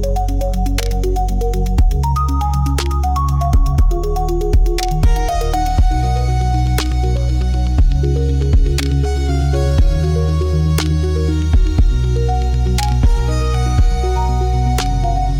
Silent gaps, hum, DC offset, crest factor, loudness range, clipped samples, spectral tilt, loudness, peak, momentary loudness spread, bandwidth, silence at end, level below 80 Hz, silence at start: none; none; under 0.1%; 10 dB; 1 LU; under 0.1%; -6.5 dB/octave; -17 LUFS; -4 dBFS; 3 LU; 16.5 kHz; 0 s; -16 dBFS; 0 s